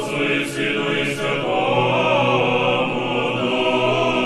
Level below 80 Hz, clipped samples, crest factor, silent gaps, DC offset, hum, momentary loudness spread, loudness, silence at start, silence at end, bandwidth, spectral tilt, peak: -52 dBFS; under 0.1%; 14 dB; none; under 0.1%; none; 4 LU; -19 LUFS; 0 s; 0 s; 13 kHz; -5 dB/octave; -6 dBFS